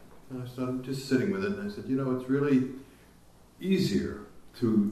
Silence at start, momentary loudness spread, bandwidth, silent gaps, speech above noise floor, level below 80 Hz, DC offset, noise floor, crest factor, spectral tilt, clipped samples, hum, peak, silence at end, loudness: 0 s; 14 LU; 13.5 kHz; none; 27 dB; -58 dBFS; under 0.1%; -56 dBFS; 16 dB; -7 dB/octave; under 0.1%; none; -14 dBFS; 0 s; -30 LUFS